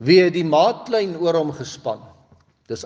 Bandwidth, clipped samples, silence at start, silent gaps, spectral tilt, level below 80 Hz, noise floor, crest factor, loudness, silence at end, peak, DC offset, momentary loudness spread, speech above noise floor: 7.6 kHz; under 0.1%; 0 s; none; -6 dB/octave; -66 dBFS; -55 dBFS; 18 dB; -19 LUFS; 0 s; -2 dBFS; under 0.1%; 15 LU; 37 dB